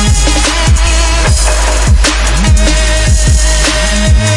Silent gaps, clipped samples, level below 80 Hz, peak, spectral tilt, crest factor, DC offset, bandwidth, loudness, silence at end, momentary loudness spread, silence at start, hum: none; under 0.1%; -10 dBFS; 0 dBFS; -3.5 dB/octave; 8 dB; under 0.1%; 11.5 kHz; -9 LUFS; 0 s; 1 LU; 0 s; none